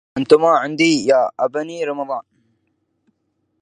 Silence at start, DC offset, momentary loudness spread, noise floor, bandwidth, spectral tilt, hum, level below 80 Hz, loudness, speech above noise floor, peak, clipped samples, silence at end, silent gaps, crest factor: 0.15 s; under 0.1%; 12 LU; -69 dBFS; 10 kHz; -4.5 dB/octave; none; -64 dBFS; -17 LUFS; 53 dB; 0 dBFS; under 0.1%; 1.4 s; none; 18 dB